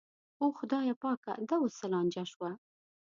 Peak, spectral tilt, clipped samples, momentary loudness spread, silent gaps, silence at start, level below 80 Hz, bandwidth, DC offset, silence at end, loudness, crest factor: -20 dBFS; -6 dB/octave; under 0.1%; 9 LU; 0.96-1.01 s, 1.17-1.23 s, 2.36-2.40 s; 0.4 s; -84 dBFS; 7.4 kHz; under 0.1%; 0.5 s; -35 LUFS; 16 dB